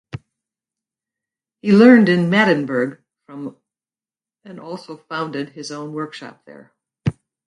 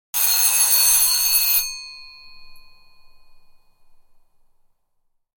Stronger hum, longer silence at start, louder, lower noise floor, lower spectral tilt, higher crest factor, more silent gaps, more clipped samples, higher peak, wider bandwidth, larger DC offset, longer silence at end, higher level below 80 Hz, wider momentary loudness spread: neither; about the same, 0.15 s vs 0.15 s; about the same, -16 LUFS vs -15 LUFS; first, under -90 dBFS vs -67 dBFS; first, -7 dB/octave vs 4.5 dB/octave; about the same, 20 dB vs 20 dB; neither; neither; first, 0 dBFS vs -4 dBFS; second, 10 kHz vs 19.5 kHz; neither; second, 0.35 s vs 2 s; about the same, -54 dBFS vs -54 dBFS; first, 25 LU vs 16 LU